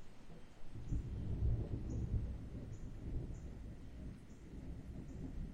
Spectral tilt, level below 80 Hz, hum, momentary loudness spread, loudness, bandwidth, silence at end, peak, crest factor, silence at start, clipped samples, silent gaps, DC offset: -8.5 dB/octave; -46 dBFS; none; 15 LU; -46 LUFS; 9.2 kHz; 0 s; -26 dBFS; 16 dB; 0 s; under 0.1%; none; under 0.1%